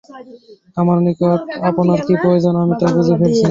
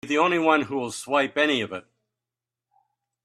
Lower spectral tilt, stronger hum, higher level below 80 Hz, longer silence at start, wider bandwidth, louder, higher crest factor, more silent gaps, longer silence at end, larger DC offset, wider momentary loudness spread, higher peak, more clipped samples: first, -8 dB/octave vs -4 dB/octave; neither; first, -50 dBFS vs -70 dBFS; about the same, 0.1 s vs 0.05 s; second, 7.6 kHz vs 13 kHz; first, -15 LUFS vs -23 LUFS; second, 12 dB vs 20 dB; neither; second, 0 s vs 1.45 s; neither; second, 4 LU vs 11 LU; first, -2 dBFS vs -6 dBFS; neither